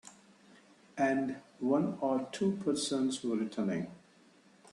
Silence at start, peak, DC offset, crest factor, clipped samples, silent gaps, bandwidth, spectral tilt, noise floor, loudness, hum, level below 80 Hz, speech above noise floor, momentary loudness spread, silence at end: 0.05 s; -18 dBFS; under 0.1%; 18 dB; under 0.1%; none; 11.5 kHz; -5 dB/octave; -63 dBFS; -33 LUFS; none; -76 dBFS; 30 dB; 8 LU; 0.75 s